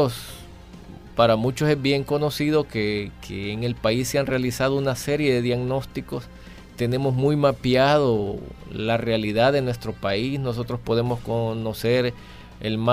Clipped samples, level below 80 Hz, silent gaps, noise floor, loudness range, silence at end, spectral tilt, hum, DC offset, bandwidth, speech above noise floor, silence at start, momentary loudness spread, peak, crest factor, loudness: under 0.1%; -46 dBFS; none; -42 dBFS; 3 LU; 0 s; -6 dB/octave; none; under 0.1%; 15.5 kHz; 19 dB; 0 s; 14 LU; -6 dBFS; 18 dB; -23 LUFS